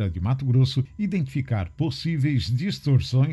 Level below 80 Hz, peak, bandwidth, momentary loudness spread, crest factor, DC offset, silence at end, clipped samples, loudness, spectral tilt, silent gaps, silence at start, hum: -40 dBFS; -10 dBFS; 11.5 kHz; 6 LU; 12 dB; under 0.1%; 0 s; under 0.1%; -24 LUFS; -7.5 dB/octave; none; 0 s; none